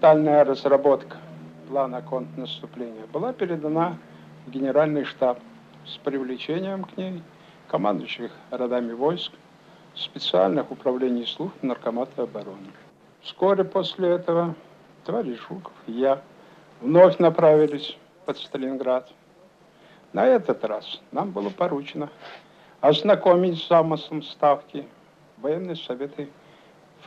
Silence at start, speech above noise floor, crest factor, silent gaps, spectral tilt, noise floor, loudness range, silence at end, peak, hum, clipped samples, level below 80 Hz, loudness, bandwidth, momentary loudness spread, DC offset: 0 s; 31 dB; 22 dB; none; -7.5 dB/octave; -54 dBFS; 8 LU; 0.8 s; -2 dBFS; none; under 0.1%; -74 dBFS; -24 LUFS; 7.4 kHz; 18 LU; under 0.1%